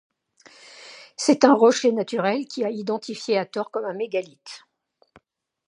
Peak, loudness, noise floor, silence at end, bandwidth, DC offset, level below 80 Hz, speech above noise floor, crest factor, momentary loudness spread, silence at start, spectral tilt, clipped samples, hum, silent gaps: 0 dBFS; -22 LUFS; -63 dBFS; 1.1 s; 11 kHz; under 0.1%; -76 dBFS; 41 dB; 24 dB; 24 LU; 0.75 s; -4 dB/octave; under 0.1%; none; none